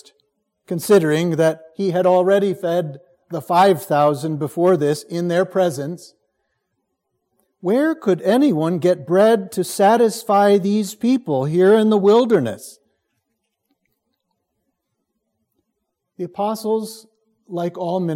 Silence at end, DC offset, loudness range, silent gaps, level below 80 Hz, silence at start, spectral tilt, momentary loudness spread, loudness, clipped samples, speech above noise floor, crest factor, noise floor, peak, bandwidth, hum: 0 s; under 0.1%; 12 LU; none; -70 dBFS; 0.7 s; -6 dB/octave; 13 LU; -18 LUFS; under 0.1%; 59 dB; 16 dB; -76 dBFS; -2 dBFS; 16.5 kHz; none